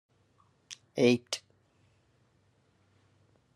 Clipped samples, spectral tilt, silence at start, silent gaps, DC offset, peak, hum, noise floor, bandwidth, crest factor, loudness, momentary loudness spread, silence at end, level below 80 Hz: under 0.1%; -4.5 dB/octave; 0.7 s; none; under 0.1%; -12 dBFS; none; -69 dBFS; 12.5 kHz; 24 dB; -30 LUFS; 23 LU; 2.15 s; -80 dBFS